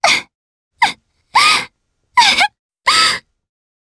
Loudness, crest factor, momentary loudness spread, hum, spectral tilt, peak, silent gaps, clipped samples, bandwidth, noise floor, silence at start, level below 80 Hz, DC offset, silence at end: -13 LUFS; 16 dB; 7 LU; none; 0.5 dB/octave; 0 dBFS; 0.35-0.71 s, 2.59-2.69 s; under 0.1%; 11 kHz; -57 dBFS; 0 s; -54 dBFS; under 0.1%; 0.75 s